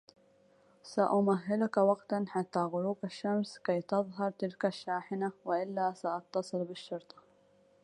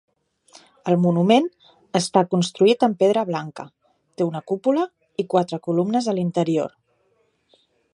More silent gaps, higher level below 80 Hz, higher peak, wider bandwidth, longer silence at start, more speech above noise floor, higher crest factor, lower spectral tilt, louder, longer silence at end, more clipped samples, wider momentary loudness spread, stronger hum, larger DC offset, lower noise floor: neither; second, -80 dBFS vs -70 dBFS; second, -14 dBFS vs -2 dBFS; about the same, 10.5 kHz vs 11.5 kHz; about the same, 0.85 s vs 0.85 s; second, 33 dB vs 46 dB; about the same, 20 dB vs 20 dB; about the same, -7 dB/octave vs -6 dB/octave; second, -34 LUFS vs -21 LUFS; second, 0.85 s vs 1.25 s; neither; second, 9 LU vs 13 LU; neither; neither; about the same, -66 dBFS vs -66 dBFS